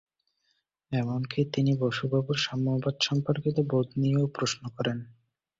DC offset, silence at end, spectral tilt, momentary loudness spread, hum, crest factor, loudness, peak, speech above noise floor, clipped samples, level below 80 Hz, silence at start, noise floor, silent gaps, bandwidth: under 0.1%; 0.5 s; -6 dB/octave; 5 LU; none; 18 dB; -28 LUFS; -12 dBFS; 48 dB; under 0.1%; -62 dBFS; 0.9 s; -75 dBFS; none; 7.8 kHz